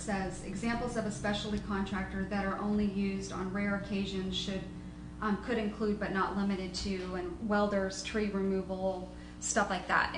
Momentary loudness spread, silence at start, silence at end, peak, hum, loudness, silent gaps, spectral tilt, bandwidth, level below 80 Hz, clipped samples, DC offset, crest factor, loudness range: 7 LU; 0 s; 0 s; -14 dBFS; 60 Hz at -50 dBFS; -34 LUFS; none; -5 dB/octave; 10 kHz; -50 dBFS; under 0.1%; under 0.1%; 18 dB; 2 LU